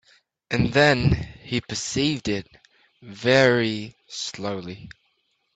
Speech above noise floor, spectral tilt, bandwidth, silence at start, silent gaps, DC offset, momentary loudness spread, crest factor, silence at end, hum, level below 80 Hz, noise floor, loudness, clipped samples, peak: 48 dB; -5 dB/octave; 9.2 kHz; 0.5 s; none; under 0.1%; 15 LU; 20 dB; 0.65 s; none; -46 dBFS; -70 dBFS; -23 LUFS; under 0.1%; -4 dBFS